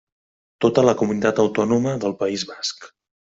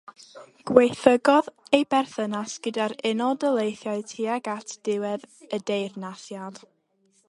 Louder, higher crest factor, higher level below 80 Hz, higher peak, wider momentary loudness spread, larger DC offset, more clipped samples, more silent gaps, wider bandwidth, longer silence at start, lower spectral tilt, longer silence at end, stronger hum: first, -20 LUFS vs -24 LUFS; second, 18 dB vs 24 dB; first, -58 dBFS vs -70 dBFS; about the same, -2 dBFS vs 0 dBFS; second, 10 LU vs 17 LU; neither; neither; neither; second, 8 kHz vs 11.5 kHz; first, 0.6 s vs 0.35 s; about the same, -5.5 dB/octave vs -4.5 dB/octave; second, 0.4 s vs 0.7 s; neither